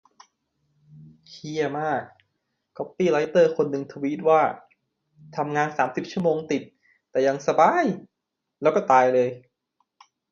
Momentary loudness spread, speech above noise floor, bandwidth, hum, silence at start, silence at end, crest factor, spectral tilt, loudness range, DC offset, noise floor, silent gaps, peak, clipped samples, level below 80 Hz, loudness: 15 LU; 60 dB; 7.4 kHz; none; 0.95 s; 0.95 s; 20 dB; -6 dB/octave; 4 LU; under 0.1%; -82 dBFS; none; -4 dBFS; under 0.1%; -70 dBFS; -23 LUFS